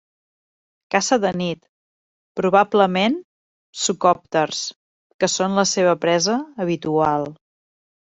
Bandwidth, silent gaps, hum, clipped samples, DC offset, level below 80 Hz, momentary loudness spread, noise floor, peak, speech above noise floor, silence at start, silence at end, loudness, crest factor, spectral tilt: 8.2 kHz; 1.69-2.35 s, 3.24-3.73 s, 4.76-5.19 s; none; under 0.1%; under 0.1%; -62 dBFS; 10 LU; under -90 dBFS; -2 dBFS; over 71 dB; 0.9 s; 0.65 s; -20 LUFS; 20 dB; -4 dB/octave